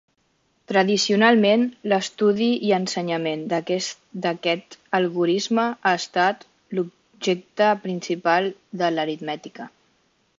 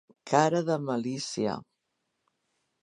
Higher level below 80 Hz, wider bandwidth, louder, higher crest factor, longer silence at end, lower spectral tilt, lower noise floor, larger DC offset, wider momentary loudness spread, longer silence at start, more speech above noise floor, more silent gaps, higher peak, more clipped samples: about the same, -72 dBFS vs -72 dBFS; second, 7.8 kHz vs 11.5 kHz; first, -22 LUFS vs -28 LUFS; about the same, 20 dB vs 24 dB; second, 0.7 s vs 1.25 s; about the same, -4.5 dB/octave vs -5 dB/octave; second, -67 dBFS vs -80 dBFS; neither; first, 12 LU vs 9 LU; first, 0.7 s vs 0.25 s; second, 45 dB vs 53 dB; neither; about the same, -4 dBFS vs -6 dBFS; neither